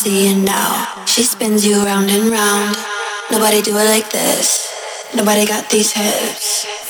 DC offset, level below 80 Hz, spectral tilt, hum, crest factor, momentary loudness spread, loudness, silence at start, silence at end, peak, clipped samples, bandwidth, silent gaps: under 0.1%; -62 dBFS; -2.5 dB/octave; none; 14 dB; 6 LU; -14 LUFS; 0 s; 0 s; 0 dBFS; under 0.1%; over 20 kHz; none